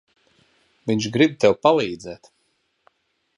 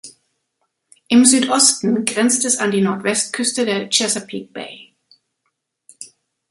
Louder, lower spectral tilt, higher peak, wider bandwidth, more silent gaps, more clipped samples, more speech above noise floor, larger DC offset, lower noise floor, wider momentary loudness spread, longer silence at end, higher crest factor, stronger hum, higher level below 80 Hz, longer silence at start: second, -19 LUFS vs -15 LUFS; first, -5.5 dB/octave vs -2.5 dB/octave; about the same, -2 dBFS vs 0 dBFS; about the same, 11 kHz vs 12 kHz; neither; neither; second, 50 dB vs 56 dB; neither; second, -69 dBFS vs -73 dBFS; second, 19 LU vs 22 LU; first, 1.25 s vs 0.45 s; about the same, 22 dB vs 20 dB; neither; first, -60 dBFS vs -66 dBFS; first, 0.85 s vs 0.05 s